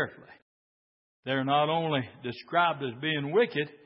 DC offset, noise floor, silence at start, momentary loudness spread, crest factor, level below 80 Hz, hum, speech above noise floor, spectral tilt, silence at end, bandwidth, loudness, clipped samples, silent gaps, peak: under 0.1%; under -90 dBFS; 0 s; 10 LU; 20 dB; -74 dBFS; none; over 61 dB; -9.5 dB/octave; 0.1 s; 5.8 kHz; -28 LUFS; under 0.1%; 0.42-1.23 s; -10 dBFS